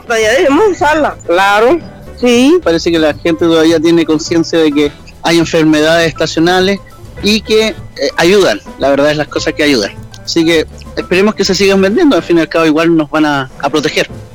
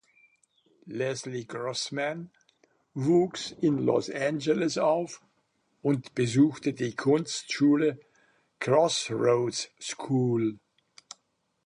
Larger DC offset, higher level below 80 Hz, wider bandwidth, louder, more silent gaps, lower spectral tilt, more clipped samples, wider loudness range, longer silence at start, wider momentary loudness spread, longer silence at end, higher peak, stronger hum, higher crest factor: neither; first, -36 dBFS vs -72 dBFS; first, 18 kHz vs 10.5 kHz; first, -10 LUFS vs -28 LUFS; neither; about the same, -4.5 dB/octave vs -5.5 dB/octave; neither; about the same, 2 LU vs 3 LU; second, 0.05 s vs 0.85 s; second, 7 LU vs 13 LU; second, 0 s vs 1.1 s; first, 0 dBFS vs -10 dBFS; neither; second, 10 dB vs 20 dB